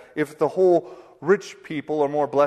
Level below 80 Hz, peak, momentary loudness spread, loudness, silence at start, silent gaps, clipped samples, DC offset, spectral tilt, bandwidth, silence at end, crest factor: -68 dBFS; -6 dBFS; 12 LU; -23 LUFS; 0.15 s; none; under 0.1%; under 0.1%; -6.5 dB/octave; 13 kHz; 0 s; 16 dB